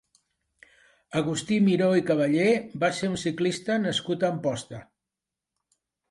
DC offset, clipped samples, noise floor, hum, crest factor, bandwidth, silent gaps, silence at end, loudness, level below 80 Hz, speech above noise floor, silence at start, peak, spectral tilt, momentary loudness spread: under 0.1%; under 0.1%; -88 dBFS; none; 16 dB; 11.5 kHz; none; 1.3 s; -25 LUFS; -66 dBFS; 63 dB; 1.1 s; -10 dBFS; -5.5 dB/octave; 9 LU